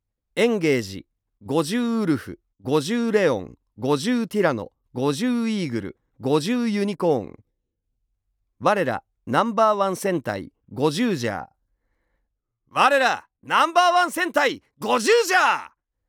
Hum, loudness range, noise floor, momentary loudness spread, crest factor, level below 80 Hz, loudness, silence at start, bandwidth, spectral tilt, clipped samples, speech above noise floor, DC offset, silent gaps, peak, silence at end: none; 5 LU; -77 dBFS; 14 LU; 20 dB; -68 dBFS; -22 LUFS; 0.35 s; 19 kHz; -4.5 dB/octave; under 0.1%; 55 dB; under 0.1%; none; -4 dBFS; 0.45 s